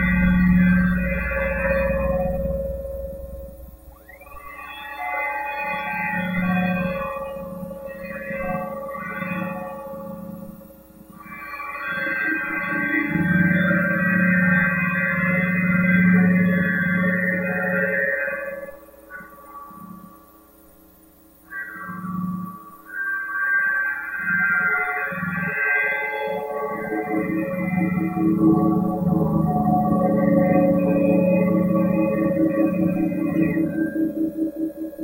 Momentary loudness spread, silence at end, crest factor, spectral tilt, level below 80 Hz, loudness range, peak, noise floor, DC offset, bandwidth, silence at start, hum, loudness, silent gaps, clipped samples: 17 LU; 0 s; 16 dB; -9 dB/octave; -40 dBFS; 12 LU; -6 dBFS; -51 dBFS; under 0.1%; 16 kHz; 0 s; none; -21 LUFS; none; under 0.1%